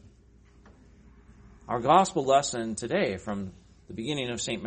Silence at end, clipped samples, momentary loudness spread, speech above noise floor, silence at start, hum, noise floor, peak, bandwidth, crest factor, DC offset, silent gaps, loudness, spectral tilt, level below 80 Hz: 0 s; under 0.1%; 15 LU; 30 dB; 0.05 s; none; -57 dBFS; -6 dBFS; 8.8 kHz; 24 dB; under 0.1%; none; -27 LUFS; -4 dB/octave; -56 dBFS